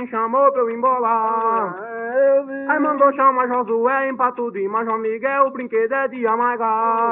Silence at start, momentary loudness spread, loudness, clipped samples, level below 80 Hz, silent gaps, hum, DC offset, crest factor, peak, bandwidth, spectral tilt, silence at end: 0 s; 6 LU; -19 LUFS; under 0.1%; -74 dBFS; none; none; under 0.1%; 16 dB; -2 dBFS; 3.7 kHz; -4.5 dB/octave; 0 s